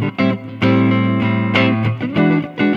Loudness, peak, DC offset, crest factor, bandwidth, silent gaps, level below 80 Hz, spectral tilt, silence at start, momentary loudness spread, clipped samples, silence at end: -16 LUFS; 0 dBFS; under 0.1%; 16 dB; 6.8 kHz; none; -52 dBFS; -8.5 dB/octave; 0 s; 4 LU; under 0.1%; 0 s